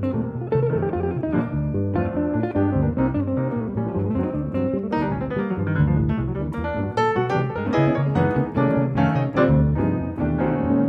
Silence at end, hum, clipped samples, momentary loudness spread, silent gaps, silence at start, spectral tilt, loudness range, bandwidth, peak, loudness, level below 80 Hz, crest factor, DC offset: 0 s; none; under 0.1%; 5 LU; none; 0 s; -9.5 dB/octave; 3 LU; 6.2 kHz; -6 dBFS; -22 LUFS; -36 dBFS; 16 dB; under 0.1%